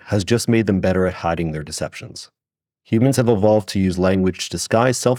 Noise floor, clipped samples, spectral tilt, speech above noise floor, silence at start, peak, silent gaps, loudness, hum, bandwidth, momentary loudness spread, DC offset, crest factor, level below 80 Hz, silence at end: -71 dBFS; under 0.1%; -5.5 dB/octave; 53 dB; 0.05 s; -2 dBFS; none; -19 LUFS; none; 17 kHz; 11 LU; under 0.1%; 16 dB; -50 dBFS; 0 s